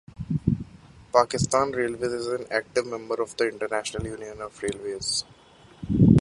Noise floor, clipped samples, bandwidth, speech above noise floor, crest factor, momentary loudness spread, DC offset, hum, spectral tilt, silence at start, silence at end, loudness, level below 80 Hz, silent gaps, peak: -49 dBFS; under 0.1%; 11.5 kHz; 22 dB; 22 dB; 12 LU; under 0.1%; none; -5.5 dB/octave; 0.2 s; 0 s; -26 LUFS; -44 dBFS; none; -4 dBFS